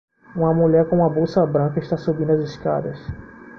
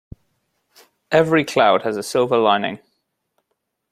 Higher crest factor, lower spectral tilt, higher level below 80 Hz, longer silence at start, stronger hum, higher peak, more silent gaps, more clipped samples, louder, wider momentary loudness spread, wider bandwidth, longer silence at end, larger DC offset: about the same, 14 dB vs 18 dB; first, -9.5 dB/octave vs -5 dB/octave; first, -48 dBFS vs -56 dBFS; second, 0.35 s vs 1.1 s; neither; about the same, -4 dBFS vs -2 dBFS; neither; neither; about the same, -20 LUFS vs -18 LUFS; first, 17 LU vs 7 LU; second, 6.6 kHz vs 14.5 kHz; second, 0 s vs 1.15 s; neither